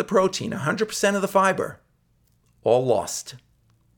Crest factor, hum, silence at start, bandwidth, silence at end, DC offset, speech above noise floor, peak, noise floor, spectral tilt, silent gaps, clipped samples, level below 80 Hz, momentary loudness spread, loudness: 18 dB; none; 0 s; 19 kHz; 0.6 s; under 0.1%; 42 dB; -6 dBFS; -64 dBFS; -4.5 dB/octave; none; under 0.1%; -62 dBFS; 11 LU; -23 LUFS